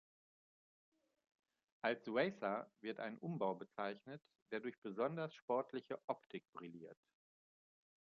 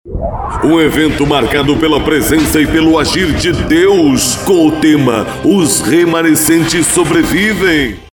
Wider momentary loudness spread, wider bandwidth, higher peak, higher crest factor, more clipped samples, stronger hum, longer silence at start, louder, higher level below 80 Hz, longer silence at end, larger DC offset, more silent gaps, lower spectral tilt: first, 15 LU vs 4 LU; second, 7.2 kHz vs over 20 kHz; second, -22 dBFS vs 0 dBFS; first, 24 dB vs 10 dB; neither; neither; first, 1.85 s vs 0.05 s; second, -45 LUFS vs -10 LUFS; second, under -90 dBFS vs -28 dBFS; first, 1.1 s vs 0.1 s; neither; first, 4.42-4.46 s, 4.78-4.82 s, 5.42-5.48 s, 6.04-6.08 s, 6.26-6.30 s, 6.49-6.53 s vs none; about the same, -4.5 dB/octave vs -4 dB/octave